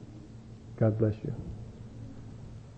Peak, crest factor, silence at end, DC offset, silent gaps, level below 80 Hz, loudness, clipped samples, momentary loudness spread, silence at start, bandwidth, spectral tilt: -16 dBFS; 20 dB; 0 s; under 0.1%; none; -52 dBFS; -31 LUFS; under 0.1%; 21 LU; 0 s; 7.8 kHz; -10 dB/octave